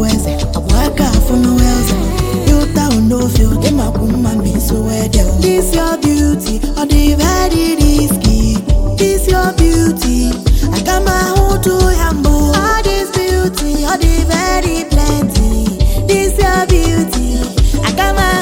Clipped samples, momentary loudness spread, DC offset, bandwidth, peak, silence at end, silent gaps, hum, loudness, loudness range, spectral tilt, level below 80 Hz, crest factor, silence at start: under 0.1%; 3 LU; under 0.1%; 17 kHz; 0 dBFS; 0 s; none; none; -13 LUFS; 1 LU; -5 dB/octave; -14 dBFS; 10 dB; 0 s